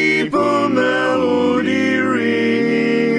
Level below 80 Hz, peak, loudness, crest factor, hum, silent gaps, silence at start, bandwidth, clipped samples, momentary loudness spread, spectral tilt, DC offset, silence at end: -60 dBFS; -4 dBFS; -16 LUFS; 12 dB; none; none; 0 s; 10.5 kHz; under 0.1%; 1 LU; -5.5 dB/octave; under 0.1%; 0 s